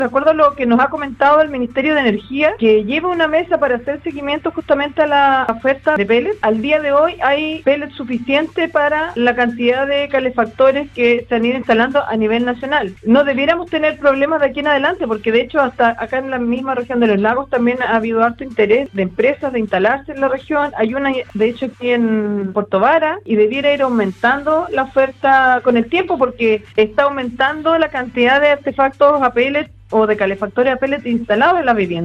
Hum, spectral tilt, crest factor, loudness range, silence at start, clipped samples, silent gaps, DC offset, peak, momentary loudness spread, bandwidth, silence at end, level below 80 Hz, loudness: none; -6.5 dB/octave; 14 dB; 2 LU; 0 s; under 0.1%; none; under 0.1%; 0 dBFS; 6 LU; 7.8 kHz; 0 s; -46 dBFS; -15 LUFS